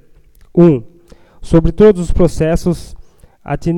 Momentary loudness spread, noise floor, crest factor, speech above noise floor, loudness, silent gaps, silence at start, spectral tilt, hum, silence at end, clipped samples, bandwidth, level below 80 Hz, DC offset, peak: 10 LU; -43 dBFS; 14 dB; 32 dB; -13 LUFS; none; 0.55 s; -8 dB/octave; none; 0 s; 0.2%; 12 kHz; -24 dBFS; under 0.1%; 0 dBFS